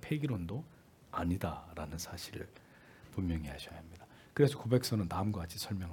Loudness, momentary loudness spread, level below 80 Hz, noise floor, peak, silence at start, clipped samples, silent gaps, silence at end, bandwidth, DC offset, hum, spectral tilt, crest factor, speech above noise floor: -37 LUFS; 17 LU; -58 dBFS; -57 dBFS; -14 dBFS; 0 s; under 0.1%; none; 0 s; 18 kHz; under 0.1%; none; -6 dB/octave; 22 dB; 21 dB